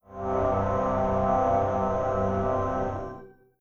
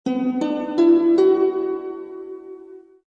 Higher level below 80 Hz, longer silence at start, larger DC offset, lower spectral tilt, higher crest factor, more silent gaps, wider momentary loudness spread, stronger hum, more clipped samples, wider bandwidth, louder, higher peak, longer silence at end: first, -42 dBFS vs -64 dBFS; about the same, 0.1 s vs 0.05 s; neither; first, -8.5 dB/octave vs -7 dB/octave; about the same, 14 dB vs 14 dB; neither; second, 8 LU vs 20 LU; neither; neither; about the same, 7 kHz vs 7.2 kHz; second, -26 LUFS vs -19 LUFS; second, -12 dBFS vs -6 dBFS; about the same, 0.3 s vs 0.3 s